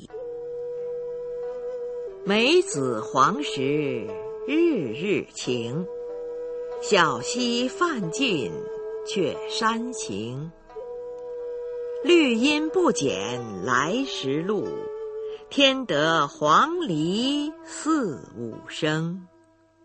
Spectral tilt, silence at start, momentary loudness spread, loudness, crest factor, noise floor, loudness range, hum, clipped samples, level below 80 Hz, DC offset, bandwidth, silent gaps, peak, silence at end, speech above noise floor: -4 dB/octave; 0 s; 14 LU; -25 LUFS; 22 dB; -58 dBFS; 4 LU; none; under 0.1%; -62 dBFS; under 0.1%; 8.8 kHz; none; -4 dBFS; 0.6 s; 34 dB